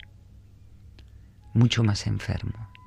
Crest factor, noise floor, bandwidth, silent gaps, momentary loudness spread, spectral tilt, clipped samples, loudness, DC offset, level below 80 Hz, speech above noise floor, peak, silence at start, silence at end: 20 dB; -50 dBFS; 10 kHz; none; 11 LU; -6 dB/octave; under 0.1%; -26 LUFS; under 0.1%; -48 dBFS; 26 dB; -8 dBFS; 0.85 s; 0.2 s